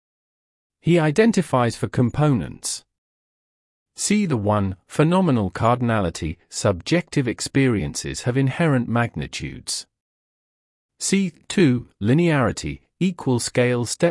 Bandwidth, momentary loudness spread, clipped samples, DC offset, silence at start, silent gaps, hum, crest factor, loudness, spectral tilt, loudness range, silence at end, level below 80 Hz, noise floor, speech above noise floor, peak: 12 kHz; 10 LU; under 0.1%; under 0.1%; 0.85 s; 2.98-3.86 s, 10.00-10.89 s; none; 18 dB; -21 LUFS; -5.5 dB/octave; 3 LU; 0 s; -48 dBFS; under -90 dBFS; over 70 dB; -4 dBFS